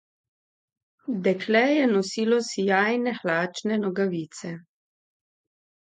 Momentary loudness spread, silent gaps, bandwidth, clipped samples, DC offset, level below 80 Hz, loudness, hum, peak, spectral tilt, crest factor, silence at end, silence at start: 15 LU; none; 9.4 kHz; under 0.1%; under 0.1%; -76 dBFS; -24 LUFS; none; -6 dBFS; -5 dB/octave; 20 dB; 1.25 s; 1.1 s